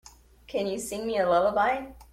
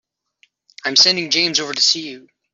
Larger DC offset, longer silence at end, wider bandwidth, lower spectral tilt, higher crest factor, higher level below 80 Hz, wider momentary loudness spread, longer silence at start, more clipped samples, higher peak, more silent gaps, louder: neither; second, 0.1 s vs 0.35 s; first, 16 kHz vs 7.8 kHz; first, -4 dB/octave vs -0.5 dB/octave; about the same, 16 dB vs 18 dB; first, -54 dBFS vs -68 dBFS; about the same, 10 LU vs 12 LU; second, 0.5 s vs 0.85 s; neither; second, -12 dBFS vs -2 dBFS; neither; second, -27 LUFS vs -14 LUFS